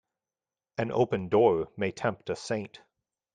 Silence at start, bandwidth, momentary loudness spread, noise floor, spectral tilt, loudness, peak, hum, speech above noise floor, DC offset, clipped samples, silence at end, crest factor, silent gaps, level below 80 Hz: 0.8 s; 9.4 kHz; 12 LU; under -90 dBFS; -6.5 dB/octave; -29 LUFS; -10 dBFS; none; over 62 dB; under 0.1%; under 0.1%; 0.7 s; 20 dB; none; -66 dBFS